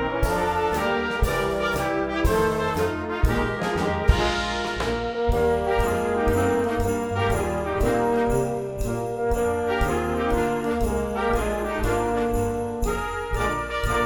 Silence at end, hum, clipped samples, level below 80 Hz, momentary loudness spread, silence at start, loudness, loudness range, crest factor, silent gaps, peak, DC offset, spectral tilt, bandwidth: 0 s; none; under 0.1%; -30 dBFS; 4 LU; 0 s; -24 LUFS; 2 LU; 20 dB; none; -4 dBFS; under 0.1%; -5.5 dB/octave; 19.5 kHz